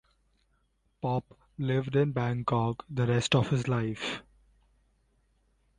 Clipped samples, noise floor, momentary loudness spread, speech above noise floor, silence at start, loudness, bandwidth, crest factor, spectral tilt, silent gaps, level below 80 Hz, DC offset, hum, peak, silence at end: under 0.1%; -72 dBFS; 10 LU; 44 dB; 1.05 s; -30 LUFS; 9.8 kHz; 20 dB; -6 dB/octave; none; -58 dBFS; under 0.1%; none; -12 dBFS; 1.6 s